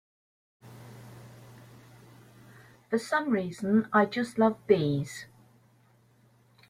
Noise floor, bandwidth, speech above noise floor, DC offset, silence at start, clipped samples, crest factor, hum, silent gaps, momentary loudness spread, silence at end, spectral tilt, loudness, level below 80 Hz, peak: -63 dBFS; 14.5 kHz; 36 dB; under 0.1%; 0.65 s; under 0.1%; 22 dB; none; none; 25 LU; 1.45 s; -6.5 dB/octave; -27 LUFS; -70 dBFS; -10 dBFS